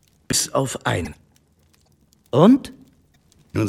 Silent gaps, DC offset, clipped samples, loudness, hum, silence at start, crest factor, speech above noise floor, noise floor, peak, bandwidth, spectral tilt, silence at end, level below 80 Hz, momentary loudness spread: none; under 0.1%; under 0.1%; -19 LUFS; none; 0.3 s; 22 dB; 41 dB; -59 dBFS; 0 dBFS; 15.5 kHz; -5 dB/octave; 0 s; -50 dBFS; 16 LU